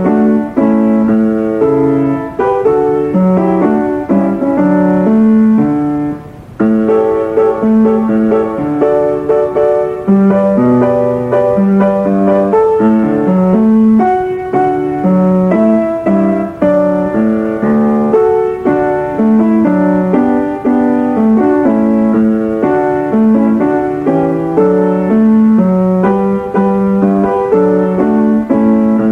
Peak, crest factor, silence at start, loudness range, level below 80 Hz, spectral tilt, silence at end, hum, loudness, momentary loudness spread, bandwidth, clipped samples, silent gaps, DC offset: 0 dBFS; 10 dB; 0 s; 1 LU; -42 dBFS; -10 dB/octave; 0 s; none; -11 LUFS; 4 LU; 3.7 kHz; under 0.1%; none; under 0.1%